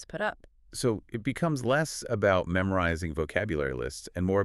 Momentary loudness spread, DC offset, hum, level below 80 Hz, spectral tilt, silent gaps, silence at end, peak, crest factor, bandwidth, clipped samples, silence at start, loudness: 8 LU; under 0.1%; none; -48 dBFS; -5.5 dB/octave; none; 0 s; -10 dBFS; 18 dB; 13.5 kHz; under 0.1%; 0 s; -29 LUFS